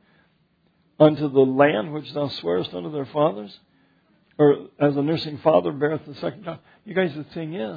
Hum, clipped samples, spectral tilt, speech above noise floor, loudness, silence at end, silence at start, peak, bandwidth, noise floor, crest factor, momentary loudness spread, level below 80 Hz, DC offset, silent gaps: none; under 0.1%; -9 dB/octave; 43 dB; -22 LUFS; 0 s; 1 s; -2 dBFS; 5 kHz; -64 dBFS; 22 dB; 14 LU; -66 dBFS; under 0.1%; none